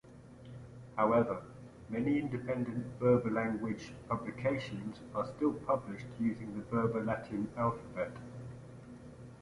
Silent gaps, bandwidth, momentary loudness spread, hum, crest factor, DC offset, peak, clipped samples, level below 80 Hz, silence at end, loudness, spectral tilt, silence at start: none; 11.5 kHz; 21 LU; none; 20 dB; under 0.1%; -16 dBFS; under 0.1%; -62 dBFS; 0 s; -35 LUFS; -8 dB/octave; 0.05 s